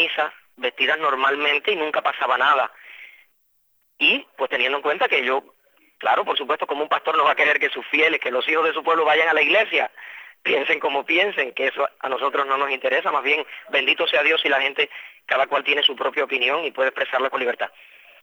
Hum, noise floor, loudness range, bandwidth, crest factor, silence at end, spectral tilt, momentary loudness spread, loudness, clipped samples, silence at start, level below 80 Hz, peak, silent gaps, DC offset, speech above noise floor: none; -65 dBFS; 3 LU; over 20 kHz; 18 dB; 0.55 s; -3 dB/octave; 8 LU; -20 LUFS; under 0.1%; 0 s; -86 dBFS; -4 dBFS; none; under 0.1%; 44 dB